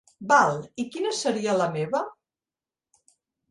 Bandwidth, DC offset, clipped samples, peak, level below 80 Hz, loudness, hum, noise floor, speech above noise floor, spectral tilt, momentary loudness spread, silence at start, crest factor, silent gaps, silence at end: 11.5 kHz; under 0.1%; under 0.1%; -6 dBFS; -72 dBFS; -24 LUFS; none; under -90 dBFS; over 66 dB; -4 dB/octave; 12 LU; 0.2 s; 22 dB; none; 1.4 s